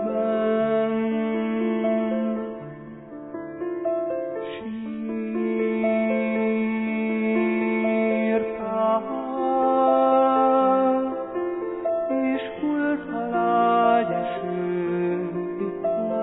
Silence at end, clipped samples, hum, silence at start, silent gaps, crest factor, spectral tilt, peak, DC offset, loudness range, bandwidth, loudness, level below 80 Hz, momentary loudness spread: 0 s; under 0.1%; none; 0 s; none; 16 dB; -11 dB/octave; -8 dBFS; under 0.1%; 6 LU; 4 kHz; -24 LUFS; -62 dBFS; 12 LU